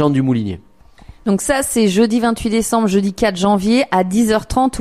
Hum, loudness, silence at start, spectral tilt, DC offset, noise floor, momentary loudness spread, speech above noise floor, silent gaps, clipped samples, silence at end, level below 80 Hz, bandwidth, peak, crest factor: none; -16 LUFS; 0 s; -5 dB/octave; 0.3%; -42 dBFS; 6 LU; 27 dB; none; under 0.1%; 0 s; -38 dBFS; 15 kHz; -2 dBFS; 14 dB